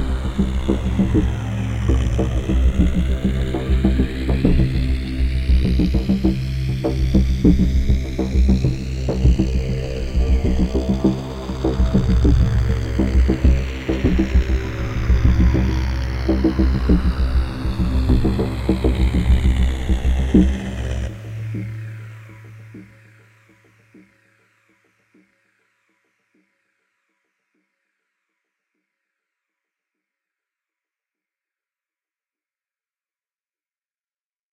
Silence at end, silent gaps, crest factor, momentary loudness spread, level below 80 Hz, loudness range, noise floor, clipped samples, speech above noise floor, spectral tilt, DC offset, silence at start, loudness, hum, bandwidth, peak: 11.7 s; none; 18 dB; 8 LU; -22 dBFS; 3 LU; under -90 dBFS; under 0.1%; over 73 dB; -8 dB/octave; under 0.1%; 0 s; -20 LUFS; none; 8.6 kHz; -2 dBFS